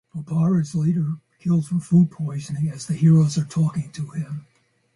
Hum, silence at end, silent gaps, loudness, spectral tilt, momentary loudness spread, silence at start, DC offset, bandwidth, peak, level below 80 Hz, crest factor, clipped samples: none; 0.55 s; none; -22 LUFS; -8 dB/octave; 13 LU; 0.15 s; under 0.1%; 11.5 kHz; -8 dBFS; -60 dBFS; 14 dB; under 0.1%